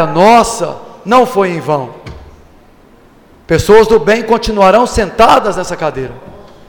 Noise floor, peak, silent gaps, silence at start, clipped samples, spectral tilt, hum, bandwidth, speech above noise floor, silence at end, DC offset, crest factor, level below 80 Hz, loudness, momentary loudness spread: -42 dBFS; 0 dBFS; none; 0 s; 0.1%; -5 dB/octave; none; 19 kHz; 33 dB; 0.3 s; under 0.1%; 12 dB; -32 dBFS; -10 LUFS; 15 LU